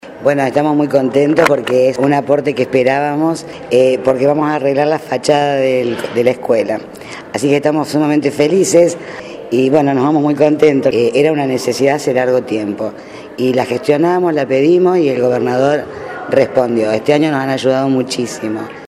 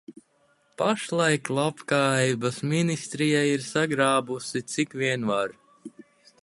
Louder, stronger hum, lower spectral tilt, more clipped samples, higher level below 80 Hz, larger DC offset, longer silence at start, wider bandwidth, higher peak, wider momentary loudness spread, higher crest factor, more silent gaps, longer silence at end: first, -13 LUFS vs -25 LUFS; neither; about the same, -5.5 dB/octave vs -4.5 dB/octave; neither; first, -54 dBFS vs -68 dBFS; neither; about the same, 0.05 s vs 0.1 s; first, 15 kHz vs 11.5 kHz; first, 0 dBFS vs -8 dBFS; first, 9 LU vs 6 LU; second, 14 dB vs 20 dB; neither; second, 0 s vs 0.55 s